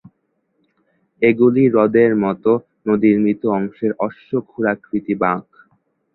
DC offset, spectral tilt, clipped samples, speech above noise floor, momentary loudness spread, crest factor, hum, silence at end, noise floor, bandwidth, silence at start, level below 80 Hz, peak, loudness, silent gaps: under 0.1%; -12 dB/octave; under 0.1%; 52 dB; 10 LU; 16 dB; none; 0.75 s; -68 dBFS; 4.2 kHz; 1.2 s; -58 dBFS; -2 dBFS; -17 LUFS; none